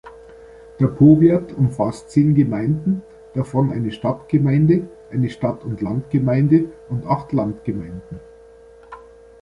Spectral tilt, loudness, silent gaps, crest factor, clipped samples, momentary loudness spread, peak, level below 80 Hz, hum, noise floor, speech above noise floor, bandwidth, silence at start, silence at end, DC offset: -9.5 dB/octave; -19 LUFS; none; 16 dB; under 0.1%; 13 LU; -2 dBFS; -48 dBFS; none; -45 dBFS; 27 dB; 11 kHz; 0.05 s; 0.45 s; under 0.1%